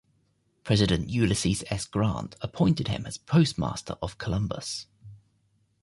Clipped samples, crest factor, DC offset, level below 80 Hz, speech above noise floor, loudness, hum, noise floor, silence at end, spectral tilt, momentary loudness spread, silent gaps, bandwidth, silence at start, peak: under 0.1%; 18 dB; under 0.1%; -46 dBFS; 43 dB; -27 LUFS; none; -70 dBFS; 0.65 s; -5.5 dB/octave; 12 LU; none; 11.5 kHz; 0.65 s; -10 dBFS